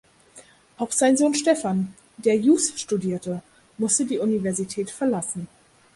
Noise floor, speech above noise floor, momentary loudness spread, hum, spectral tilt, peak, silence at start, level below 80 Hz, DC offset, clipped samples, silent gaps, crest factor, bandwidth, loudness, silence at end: -51 dBFS; 28 dB; 14 LU; none; -4.5 dB/octave; -6 dBFS; 0.35 s; -64 dBFS; under 0.1%; under 0.1%; none; 18 dB; 11.5 kHz; -23 LUFS; 0.5 s